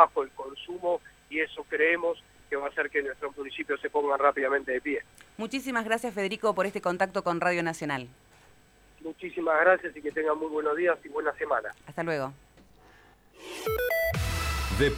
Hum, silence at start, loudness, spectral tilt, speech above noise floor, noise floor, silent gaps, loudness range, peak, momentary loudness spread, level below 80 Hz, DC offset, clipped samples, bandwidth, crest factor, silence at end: none; 0 s; -29 LUFS; -5 dB/octave; 30 dB; -58 dBFS; none; 4 LU; -4 dBFS; 12 LU; -46 dBFS; under 0.1%; under 0.1%; over 20 kHz; 24 dB; 0 s